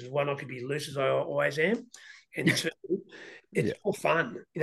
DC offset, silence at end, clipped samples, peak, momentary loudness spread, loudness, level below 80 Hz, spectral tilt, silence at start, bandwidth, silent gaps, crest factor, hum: under 0.1%; 0 s; under 0.1%; -12 dBFS; 12 LU; -30 LUFS; -72 dBFS; -5 dB/octave; 0 s; 12.5 kHz; none; 18 dB; none